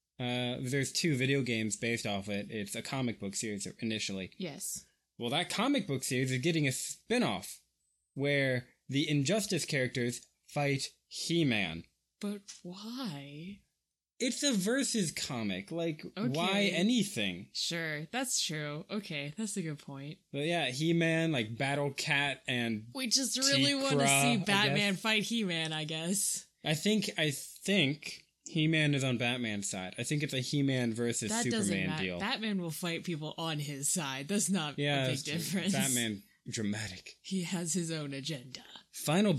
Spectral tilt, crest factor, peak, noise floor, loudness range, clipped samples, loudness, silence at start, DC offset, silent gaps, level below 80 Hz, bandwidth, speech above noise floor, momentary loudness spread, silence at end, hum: -3.5 dB/octave; 22 dB; -12 dBFS; -87 dBFS; 7 LU; under 0.1%; -32 LUFS; 0.2 s; under 0.1%; none; -72 dBFS; 15.5 kHz; 54 dB; 12 LU; 0 s; none